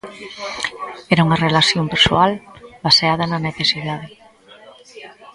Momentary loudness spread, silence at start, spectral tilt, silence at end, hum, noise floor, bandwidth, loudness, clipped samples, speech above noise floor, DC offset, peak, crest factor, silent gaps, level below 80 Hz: 17 LU; 0.05 s; -4.5 dB/octave; 0.05 s; none; -45 dBFS; 11.5 kHz; -16 LUFS; under 0.1%; 27 dB; under 0.1%; 0 dBFS; 18 dB; none; -46 dBFS